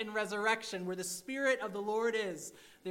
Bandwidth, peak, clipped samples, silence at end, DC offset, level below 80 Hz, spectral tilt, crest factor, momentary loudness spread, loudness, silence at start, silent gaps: 16 kHz; -18 dBFS; under 0.1%; 0 s; under 0.1%; -80 dBFS; -3 dB/octave; 18 dB; 10 LU; -35 LUFS; 0 s; none